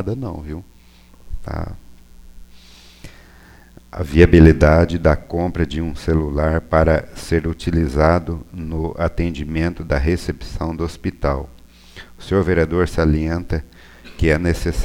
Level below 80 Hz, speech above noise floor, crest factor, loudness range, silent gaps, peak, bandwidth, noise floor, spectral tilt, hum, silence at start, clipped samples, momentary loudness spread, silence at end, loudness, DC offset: -26 dBFS; 28 dB; 18 dB; 14 LU; none; 0 dBFS; 13.5 kHz; -45 dBFS; -7.5 dB/octave; none; 0 s; under 0.1%; 15 LU; 0 s; -18 LUFS; under 0.1%